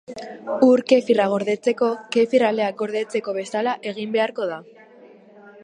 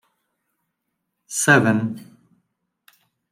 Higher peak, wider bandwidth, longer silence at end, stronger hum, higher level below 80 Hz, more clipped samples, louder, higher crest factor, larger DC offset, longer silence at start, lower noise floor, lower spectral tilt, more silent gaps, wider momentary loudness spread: about the same, -4 dBFS vs -2 dBFS; second, 10.5 kHz vs 16 kHz; second, 0.1 s vs 1.3 s; neither; second, -74 dBFS vs -68 dBFS; neither; second, -21 LUFS vs -18 LUFS; about the same, 18 dB vs 22 dB; neither; second, 0.1 s vs 1.3 s; second, -48 dBFS vs -78 dBFS; about the same, -5 dB/octave vs -4.5 dB/octave; neither; second, 12 LU vs 15 LU